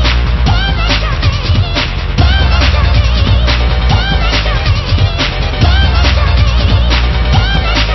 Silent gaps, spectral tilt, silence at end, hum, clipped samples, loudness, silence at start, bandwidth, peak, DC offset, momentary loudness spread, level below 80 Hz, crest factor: none; -5.5 dB/octave; 0 s; none; under 0.1%; -11 LUFS; 0 s; 6 kHz; 0 dBFS; under 0.1%; 3 LU; -12 dBFS; 10 dB